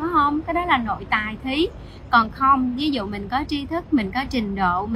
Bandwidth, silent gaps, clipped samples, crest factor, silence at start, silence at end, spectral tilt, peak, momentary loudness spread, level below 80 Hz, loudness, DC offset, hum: 13.5 kHz; none; under 0.1%; 20 dB; 0 s; 0 s; -6 dB/octave; -2 dBFS; 8 LU; -40 dBFS; -22 LUFS; under 0.1%; none